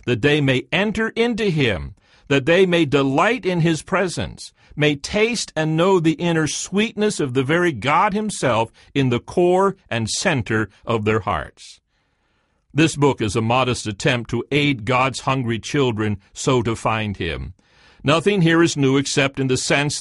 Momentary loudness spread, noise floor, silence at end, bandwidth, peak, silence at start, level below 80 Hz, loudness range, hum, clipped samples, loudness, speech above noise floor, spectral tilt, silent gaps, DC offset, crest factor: 8 LU; -66 dBFS; 0 s; 11.5 kHz; -2 dBFS; 0.05 s; -46 dBFS; 3 LU; none; under 0.1%; -19 LUFS; 47 dB; -5 dB/octave; none; under 0.1%; 18 dB